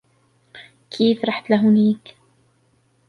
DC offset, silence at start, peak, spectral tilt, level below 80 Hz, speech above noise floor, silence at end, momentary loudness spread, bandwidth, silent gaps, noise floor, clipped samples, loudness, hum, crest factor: under 0.1%; 0.55 s; -4 dBFS; -7.5 dB/octave; -68 dBFS; 44 dB; 1.15 s; 11 LU; 6.2 kHz; none; -62 dBFS; under 0.1%; -18 LUFS; none; 18 dB